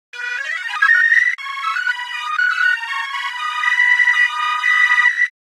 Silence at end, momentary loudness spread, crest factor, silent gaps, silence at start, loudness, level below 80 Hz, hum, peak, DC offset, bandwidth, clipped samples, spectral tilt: 0.3 s; 11 LU; 16 dB; none; 0.15 s; -15 LUFS; under -90 dBFS; none; -2 dBFS; under 0.1%; 13.5 kHz; under 0.1%; 10 dB/octave